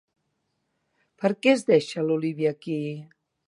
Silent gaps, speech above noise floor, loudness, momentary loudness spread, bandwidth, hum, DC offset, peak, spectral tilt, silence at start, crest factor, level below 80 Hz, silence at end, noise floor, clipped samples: none; 52 dB; -24 LUFS; 10 LU; 11.5 kHz; none; under 0.1%; -6 dBFS; -6 dB/octave; 1.2 s; 20 dB; -78 dBFS; 0.45 s; -76 dBFS; under 0.1%